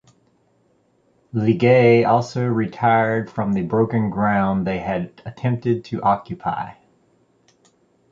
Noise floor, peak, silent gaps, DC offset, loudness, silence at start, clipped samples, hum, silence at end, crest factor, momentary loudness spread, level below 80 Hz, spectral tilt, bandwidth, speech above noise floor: -62 dBFS; -2 dBFS; none; under 0.1%; -20 LUFS; 1.35 s; under 0.1%; none; 1.4 s; 18 dB; 12 LU; -52 dBFS; -8 dB/octave; 7.6 kHz; 43 dB